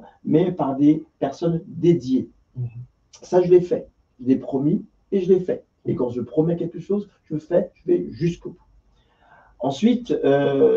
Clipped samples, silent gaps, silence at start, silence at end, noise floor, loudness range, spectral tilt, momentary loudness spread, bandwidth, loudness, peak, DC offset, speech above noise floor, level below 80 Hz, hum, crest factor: under 0.1%; none; 0 s; 0 s; -58 dBFS; 4 LU; -8.5 dB/octave; 13 LU; 7.4 kHz; -22 LUFS; -4 dBFS; under 0.1%; 38 dB; -56 dBFS; none; 18 dB